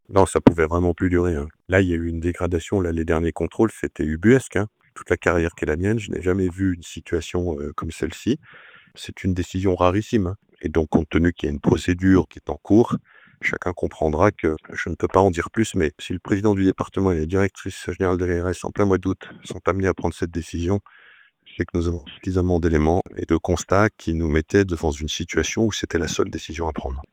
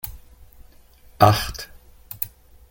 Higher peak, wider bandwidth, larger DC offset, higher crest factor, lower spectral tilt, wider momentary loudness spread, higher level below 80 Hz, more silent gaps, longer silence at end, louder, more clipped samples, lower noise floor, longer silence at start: about the same, 0 dBFS vs -2 dBFS; second, 15 kHz vs 17 kHz; neither; about the same, 22 dB vs 24 dB; first, -6.5 dB/octave vs -5 dB/octave; second, 10 LU vs 22 LU; about the same, -40 dBFS vs -44 dBFS; neither; second, 0.1 s vs 0.45 s; about the same, -22 LUFS vs -21 LUFS; neither; about the same, -52 dBFS vs -50 dBFS; about the same, 0.1 s vs 0.05 s